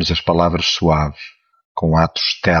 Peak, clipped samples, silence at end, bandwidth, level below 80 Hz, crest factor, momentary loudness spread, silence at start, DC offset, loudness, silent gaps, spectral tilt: -2 dBFS; under 0.1%; 0 s; 7 kHz; -32 dBFS; 16 dB; 15 LU; 0 s; under 0.1%; -16 LUFS; 1.65-1.75 s; -5 dB/octave